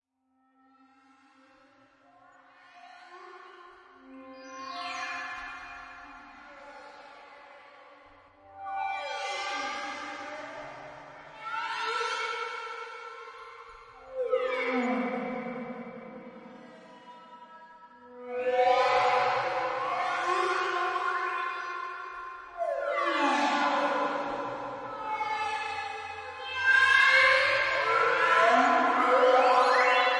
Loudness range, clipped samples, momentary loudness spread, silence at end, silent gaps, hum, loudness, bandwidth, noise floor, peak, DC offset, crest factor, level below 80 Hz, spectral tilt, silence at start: 18 LU; under 0.1%; 25 LU; 0 s; none; none; -27 LUFS; 11 kHz; -72 dBFS; -10 dBFS; under 0.1%; 20 dB; -70 dBFS; -2.5 dB/octave; 2.75 s